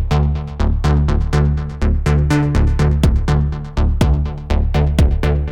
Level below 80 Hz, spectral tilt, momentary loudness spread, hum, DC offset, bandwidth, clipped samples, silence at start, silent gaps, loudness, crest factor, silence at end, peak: -16 dBFS; -7.5 dB/octave; 5 LU; none; under 0.1%; 10.5 kHz; under 0.1%; 0 s; none; -17 LUFS; 14 dB; 0 s; -2 dBFS